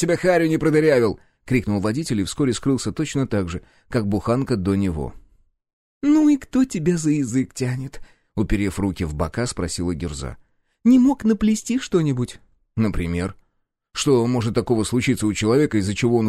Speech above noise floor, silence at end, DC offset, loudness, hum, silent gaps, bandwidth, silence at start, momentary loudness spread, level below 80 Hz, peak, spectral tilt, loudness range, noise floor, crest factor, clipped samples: 51 dB; 0 s; under 0.1%; -21 LUFS; none; 5.73-6.01 s; 14 kHz; 0 s; 12 LU; -40 dBFS; -6 dBFS; -6 dB/octave; 3 LU; -71 dBFS; 14 dB; under 0.1%